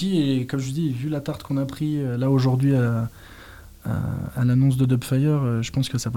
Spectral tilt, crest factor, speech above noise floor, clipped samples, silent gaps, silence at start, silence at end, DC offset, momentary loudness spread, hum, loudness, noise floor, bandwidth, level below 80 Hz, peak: -7 dB/octave; 12 dB; 22 dB; under 0.1%; none; 0 s; 0 s; 0.1%; 9 LU; none; -23 LUFS; -44 dBFS; 16 kHz; -48 dBFS; -10 dBFS